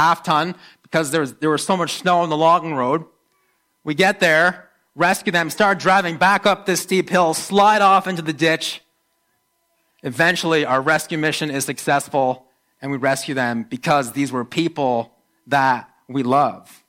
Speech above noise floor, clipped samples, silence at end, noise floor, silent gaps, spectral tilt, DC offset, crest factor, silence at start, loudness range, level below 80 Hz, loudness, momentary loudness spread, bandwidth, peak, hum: 49 dB; under 0.1%; 0.3 s; -68 dBFS; none; -4 dB/octave; under 0.1%; 16 dB; 0 s; 5 LU; -64 dBFS; -18 LUFS; 10 LU; 16.5 kHz; -4 dBFS; none